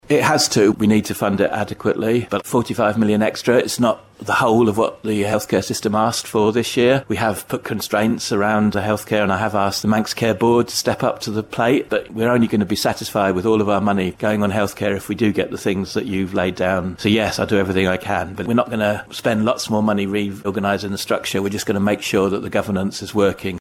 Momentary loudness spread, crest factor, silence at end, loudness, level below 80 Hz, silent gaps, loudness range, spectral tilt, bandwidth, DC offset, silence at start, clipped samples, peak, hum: 6 LU; 14 dB; 0 s; -19 LUFS; -50 dBFS; none; 2 LU; -5 dB/octave; 16.5 kHz; under 0.1%; 0.1 s; under 0.1%; -4 dBFS; none